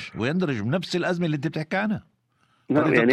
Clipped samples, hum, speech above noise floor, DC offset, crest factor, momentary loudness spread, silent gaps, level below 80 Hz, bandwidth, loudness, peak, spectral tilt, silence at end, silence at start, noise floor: under 0.1%; none; 43 dB; under 0.1%; 18 dB; 7 LU; none; -62 dBFS; 11.5 kHz; -25 LUFS; -6 dBFS; -7 dB/octave; 0 s; 0 s; -66 dBFS